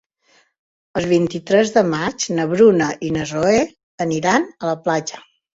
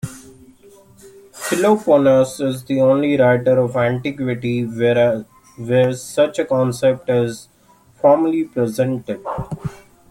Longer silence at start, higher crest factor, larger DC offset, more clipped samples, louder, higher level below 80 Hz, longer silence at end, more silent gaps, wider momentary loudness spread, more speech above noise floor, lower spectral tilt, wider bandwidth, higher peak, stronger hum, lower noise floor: first, 0.95 s vs 0.05 s; about the same, 18 dB vs 16 dB; neither; neither; about the same, -18 LUFS vs -17 LUFS; about the same, -52 dBFS vs -52 dBFS; about the same, 0.4 s vs 0.35 s; first, 3.83-3.98 s vs none; about the same, 11 LU vs 12 LU; first, 41 dB vs 34 dB; second, -5 dB/octave vs -6.5 dB/octave; second, 8 kHz vs 16.5 kHz; about the same, -2 dBFS vs -2 dBFS; neither; first, -58 dBFS vs -51 dBFS